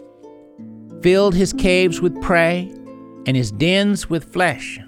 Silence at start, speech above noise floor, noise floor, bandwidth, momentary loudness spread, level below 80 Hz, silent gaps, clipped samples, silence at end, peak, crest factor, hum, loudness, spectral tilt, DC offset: 0 s; 26 dB; -43 dBFS; 15 kHz; 18 LU; -38 dBFS; none; under 0.1%; 0.05 s; -2 dBFS; 16 dB; none; -17 LUFS; -5.5 dB/octave; under 0.1%